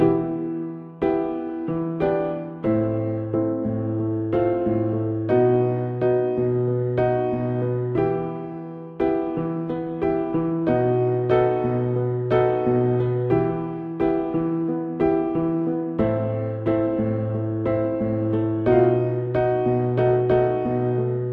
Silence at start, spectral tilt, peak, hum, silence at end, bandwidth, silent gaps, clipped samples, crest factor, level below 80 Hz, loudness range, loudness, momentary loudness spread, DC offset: 0 s; -11.5 dB/octave; -6 dBFS; none; 0 s; 4.6 kHz; none; under 0.1%; 16 dB; -48 dBFS; 3 LU; -23 LUFS; 7 LU; under 0.1%